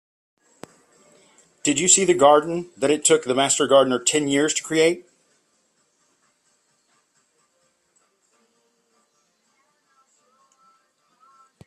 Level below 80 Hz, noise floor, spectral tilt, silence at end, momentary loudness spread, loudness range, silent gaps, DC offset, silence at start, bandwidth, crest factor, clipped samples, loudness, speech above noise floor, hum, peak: -68 dBFS; -67 dBFS; -2.5 dB/octave; 6.65 s; 9 LU; 9 LU; none; under 0.1%; 1.65 s; 14 kHz; 22 dB; under 0.1%; -18 LUFS; 49 dB; none; -2 dBFS